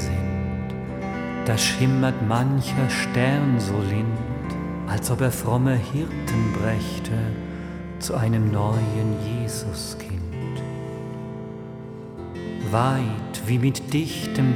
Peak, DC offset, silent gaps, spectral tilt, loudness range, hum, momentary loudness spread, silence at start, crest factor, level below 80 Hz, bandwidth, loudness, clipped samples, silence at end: -6 dBFS; under 0.1%; none; -6 dB/octave; 7 LU; none; 12 LU; 0 s; 18 dB; -42 dBFS; 16.5 kHz; -24 LUFS; under 0.1%; 0 s